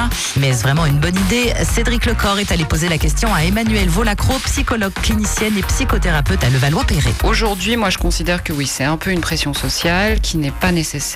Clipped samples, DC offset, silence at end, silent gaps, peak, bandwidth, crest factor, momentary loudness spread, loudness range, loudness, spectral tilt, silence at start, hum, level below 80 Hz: under 0.1%; under 0.1%; 0 s; none; -6 dBFS; 16 kHz; 10 dB; 3 LU; 1 LU; -16 LUFS; -4.5 dB/octave; 0 s; none; -22 dBFS